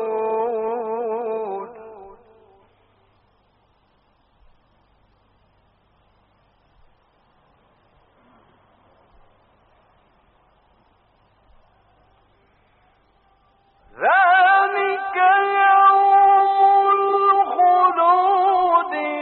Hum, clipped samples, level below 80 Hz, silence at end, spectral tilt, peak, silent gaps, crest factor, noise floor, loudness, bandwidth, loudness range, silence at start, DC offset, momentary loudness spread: none; under 0.1%; -64 dBFS; 0 s; 0.5 dB/octave; -6 dBFS; none; 16 dB; -61 dBFS; -17 LUFS; 4.3 kHz; 17 LU; 0 s; under 0.1%; 12 LU